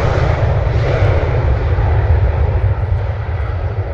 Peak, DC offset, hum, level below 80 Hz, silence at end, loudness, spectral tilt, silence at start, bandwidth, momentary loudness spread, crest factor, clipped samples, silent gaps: -2 dBFS; under 0.1%; none; -20 dBFS; 0 s; -16 LUFS; -8.5 dB/octave; 0 s; 6.8 kHz; 6 LU; 12 dB; under 0.1%; none